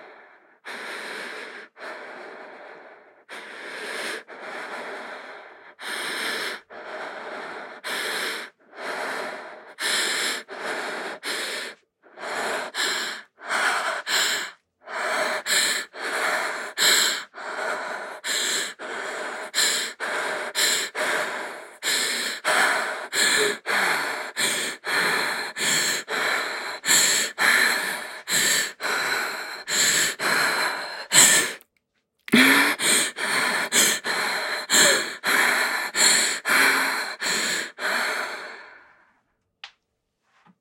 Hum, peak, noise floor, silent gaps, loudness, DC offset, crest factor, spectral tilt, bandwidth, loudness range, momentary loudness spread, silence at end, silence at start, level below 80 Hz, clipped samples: none; 0 dBFS; -76 dBFS; none; -22 LUFS; under 0.1%; 26 dB; 0 dB/octave; 16.5 kHz; 13 LU; 18 LU; 0.95 s; 0 s; -82 dBFS; under 0.1%